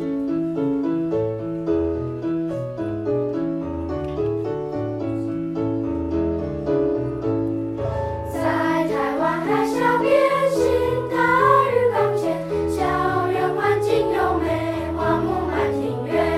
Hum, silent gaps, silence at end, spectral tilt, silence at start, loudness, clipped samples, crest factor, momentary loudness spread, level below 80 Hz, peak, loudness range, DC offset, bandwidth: none; none; 0 s; -7 dB/octave; 0 s; -22 LUFS; under 0.1%; 18 dB; 9 LU; -42 dBFS; -2 dBFS; 6 LU; under 0.1%; 14.5 kHz